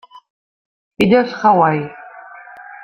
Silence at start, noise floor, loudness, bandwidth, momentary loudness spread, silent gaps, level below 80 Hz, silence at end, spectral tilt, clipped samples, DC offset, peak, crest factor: 1 s; -38 dBFS; -14 LUFS; 15 kHz; 24 LU; none; -56 dBFS; 0 s; -7 dB/octave; under 0.1%; under 0.1%; -2 dBFS; 16 dB